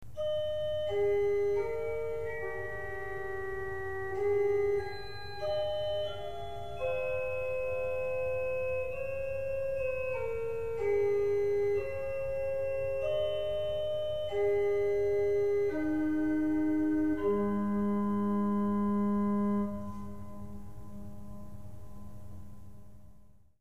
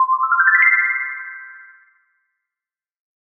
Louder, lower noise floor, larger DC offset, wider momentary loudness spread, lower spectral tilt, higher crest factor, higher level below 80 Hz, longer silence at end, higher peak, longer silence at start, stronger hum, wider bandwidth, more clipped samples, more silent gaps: second, -32 LUFS vs -14 LUFS; second, -59 dBFS vs under -90 dBFS; first, 0.8% vs under 0.1%; second, 17 LU vs 20 LU; first, -7.5 dB/octave vs -2 dB/octave; second, 12 dB vs 20 dB; first, -54 dBFS vs -82 dBFS; second, 0 s vs 1.75 s; second, -20 dBFS vs -2 dBFS; about the same, 0 s vs 0 s; neither; first, 14.5 kHz vs 3.3 kHz; neither; neither